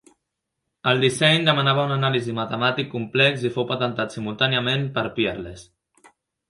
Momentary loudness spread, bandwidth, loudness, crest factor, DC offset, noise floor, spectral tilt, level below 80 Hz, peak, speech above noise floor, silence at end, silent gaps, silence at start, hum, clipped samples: 10 LU; 11.5 kHz; -21 LUFS; 20 dB; under 0.1%; -80 dBFS; -5 dB/octave; -58 dBFS; -2 dBFS; 58 dB; 0.85 s; none; 0.85 s; none; under 0.1%